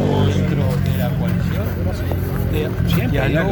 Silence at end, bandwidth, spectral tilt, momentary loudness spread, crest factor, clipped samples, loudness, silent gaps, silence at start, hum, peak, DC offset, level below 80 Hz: 0 s; 19.5 kHz; -7.5 dB/octave; 4 LU; 14 dB; under 0.1%; -19 LUFS; none; 0 s; none; -4 dBFS; under 0.1%; -28 dBFS